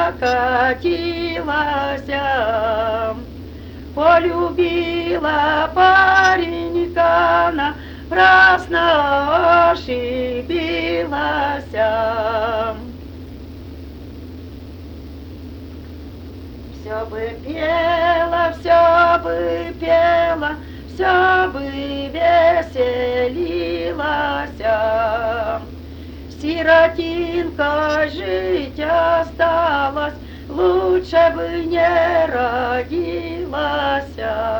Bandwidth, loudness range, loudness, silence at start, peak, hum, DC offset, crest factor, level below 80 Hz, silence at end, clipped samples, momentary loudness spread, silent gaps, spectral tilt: over 20 kHz; 10 LU; -17 LUFS; 0 s; 0 dBFS; none; under 0.1%; 16 dB; -38 dBFS; 0 s; under 0.1%; 22 LU; none; -6 dB/octave